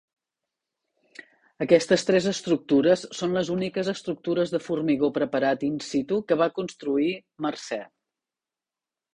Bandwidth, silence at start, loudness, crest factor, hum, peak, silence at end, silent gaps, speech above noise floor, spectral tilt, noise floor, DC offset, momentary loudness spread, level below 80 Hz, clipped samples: 11 kHz; 1.2 s; -25 LUFS; 22 dB; none; -4 dBFS; 1.3 s; none; over 66 dB; -5.5 dB/octave; under -90 dBFS; under 0.1%; 10 LU; -66 dBFS; under 0.1%